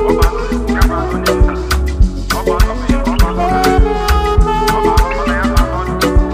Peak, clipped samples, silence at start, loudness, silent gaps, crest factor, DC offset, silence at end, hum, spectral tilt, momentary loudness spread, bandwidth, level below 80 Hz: 0 dBFS; under 0.1%; 0 s; -14 LUFS; none; 12 dB; under 0.1%; 0 s; none; -5.5 dB/octave; 4 LU; 15.5 kHz; -14 dBFS